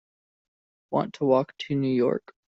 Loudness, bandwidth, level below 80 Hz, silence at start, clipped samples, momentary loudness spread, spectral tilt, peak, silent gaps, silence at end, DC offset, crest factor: -26 LUFS; 7.8 kHz; -66 dBFS; 0.9 s; under 0.1%; 6 LU; -6.5 dB/octave; -8 dBFS; none; 0.3 s; under 0.1%; 20 dB